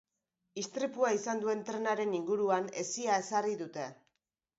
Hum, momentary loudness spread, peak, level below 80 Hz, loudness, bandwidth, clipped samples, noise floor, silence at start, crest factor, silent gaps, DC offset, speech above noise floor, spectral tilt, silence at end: none; 10 LU; -16 dBFS; -84 dBFS; -34 LUFS; 7.6 kHz; under 0.1%; -86 dBFS; 0.55 s; 18 dB; none; under 0.1%; 53 dB; -3.5 dB/octave; 0.65 s